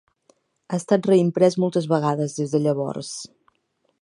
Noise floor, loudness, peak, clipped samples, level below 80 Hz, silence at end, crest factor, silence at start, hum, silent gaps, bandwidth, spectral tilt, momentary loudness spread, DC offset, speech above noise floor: -70 dBFS; -21 LUFS; -4 dBFS; under 0.1%; -70 dBFS; 0.75 s; 20 dB; 0.7 s; none; none; 11.5 kHz; -6.5 dB/octave; 14 LU; under 0.1%; 49 dB